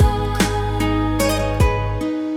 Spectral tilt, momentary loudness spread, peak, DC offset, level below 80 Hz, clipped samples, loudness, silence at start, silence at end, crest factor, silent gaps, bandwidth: -5.5 dB/octave; 4 LU; -6 dBFS; under 0.1%; -24 dBFS; under 0.1%; -19 LUFS; 0 s; 0 s; 12 dB; none; 17.5 kHz